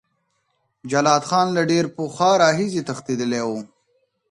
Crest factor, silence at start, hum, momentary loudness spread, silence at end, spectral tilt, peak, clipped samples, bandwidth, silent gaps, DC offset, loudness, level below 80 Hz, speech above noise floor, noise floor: 20 dB; 0.85 s; none; 10 LU; 0.65 s; -4.5 dB/octave; -2 dBFS; under 0.1%; 11.5 kHz; none; under 0.1%; -20 LUFS; -64 dBFS; 51 dB; -70 dBFS